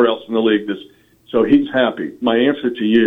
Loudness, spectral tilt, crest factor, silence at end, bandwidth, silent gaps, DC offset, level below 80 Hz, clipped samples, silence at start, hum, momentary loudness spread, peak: -17 LUFS; -7.5 dB/octave; 14 dB; 0 s; 4 kHz; none; under 0.1%; -54 dBFS; under 0.1%; 0 s; none; 8 LU; -2 dBFS